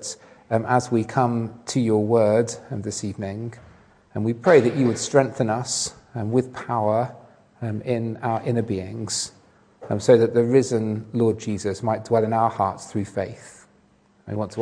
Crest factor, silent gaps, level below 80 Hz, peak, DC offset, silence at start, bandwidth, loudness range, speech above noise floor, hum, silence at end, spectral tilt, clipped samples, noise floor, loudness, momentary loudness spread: 20 dB; none; -62 dBFS; -2 dBFS; under 0.1%; 0 s; 10.5 kHz; 5 LU; 37 dB; none; 0 s; -5.5 dB/octave; under 0.1%; -59 dBFS; -23 LUFS; 14 LU